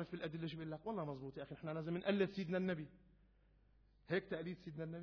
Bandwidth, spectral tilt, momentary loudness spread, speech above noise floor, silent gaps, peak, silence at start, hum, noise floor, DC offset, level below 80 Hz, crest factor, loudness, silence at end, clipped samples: 5.4 kHz; -5.5 dB/octave; 10 LU; 28 dB; none; -22 dBFS; 0 s; none; -71 dBFS; under 0.1%; -72 dBFS; 22 dB; -44 LUFS; 0 s; under 0.1%